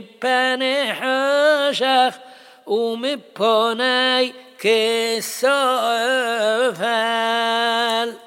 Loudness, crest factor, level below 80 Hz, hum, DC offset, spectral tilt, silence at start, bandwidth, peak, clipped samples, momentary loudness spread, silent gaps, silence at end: -19 LUFS; 14 dB; -76 dBFS; none; under 0.1%; -2 dB/octave; 0 s; 17 kHz; -4 dBFS; under 0.1%; 6 LU; none; 0.1 s